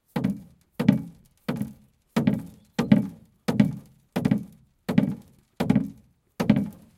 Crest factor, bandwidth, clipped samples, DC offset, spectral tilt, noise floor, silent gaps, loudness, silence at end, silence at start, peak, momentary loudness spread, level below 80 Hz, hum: 24 dB; 15.5 kHz; under 0.1%; under 0.1%; -7.5 dB/octave; -52 dBFS; none; -26 LUFS; 0.25 s; 0.15 s; -2 dBFS; 15 LU; -54 dBFS; none